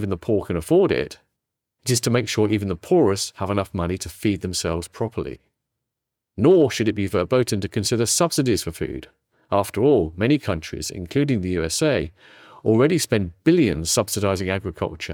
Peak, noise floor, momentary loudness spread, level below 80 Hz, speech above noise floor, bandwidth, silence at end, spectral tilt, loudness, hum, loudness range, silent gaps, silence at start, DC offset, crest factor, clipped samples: -4 dBFS; -83 dBFS; 10 LU; -48 dBFS; 62 dB; 19.5 kHz; 0 s; -5 dB/octave; -21 LUFS; none; 3 LU; none; 0 s; under 0.1%; 16 dB; under 0.1%